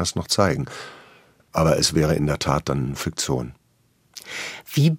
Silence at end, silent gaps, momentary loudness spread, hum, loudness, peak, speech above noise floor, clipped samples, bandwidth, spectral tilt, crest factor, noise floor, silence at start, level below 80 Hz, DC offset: 0 s; none; 18 LU; none; -22 LUFS; -2 dBFS; 41 dB; under 0.1%; 16 kHz; -4.5 dB/octave; 22 dB; -63 dBFS; 0 s; -44 dBFS; under 0.1%